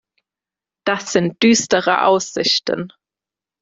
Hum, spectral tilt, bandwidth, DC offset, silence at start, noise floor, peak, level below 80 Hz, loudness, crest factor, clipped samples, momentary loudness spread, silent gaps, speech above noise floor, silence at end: none; -3 dB/octave; 7.8 kHz; under 0.1%; 0.85 s; -89 dBFS; 0 dBFS; -60 dBFS; -17 LUFS; 18 dB; under 0.1%; 11 LU; none; 72 dB; 0.75 s